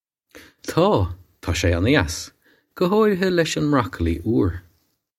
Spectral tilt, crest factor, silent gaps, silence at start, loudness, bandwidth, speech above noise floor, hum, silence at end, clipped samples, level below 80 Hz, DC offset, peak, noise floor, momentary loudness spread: -5.5 dB/octave; 20 dB; none; 0.35 s; -21 LUFS; 16 kHz; 46 dB; none; 0.6 s; under 0.1%; -38 dBFS; under 0.1%; 0 dBFS; -66 dBFS; 13 LU